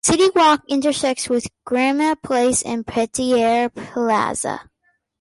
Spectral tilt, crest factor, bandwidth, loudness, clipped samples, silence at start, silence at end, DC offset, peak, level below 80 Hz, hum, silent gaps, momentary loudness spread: -3 dB/octave; 14 dB; 11.5 kHz; -19 LUFS; under 0.1%; 0.05 s; 0.6 s; under 0.1%; -4 dBFS; -52 dBFS; none; none; 9 LU